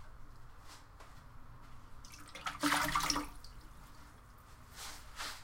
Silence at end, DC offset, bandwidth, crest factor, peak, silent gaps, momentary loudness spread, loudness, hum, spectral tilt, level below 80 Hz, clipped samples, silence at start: 0 s; under 0.1%; 16.5 kHz; 26 dB; -16 dBFS; none; 25 LU; -37 LUFS; none; -2 dB/octave; -54 dBFS; under 0.1%; 0 s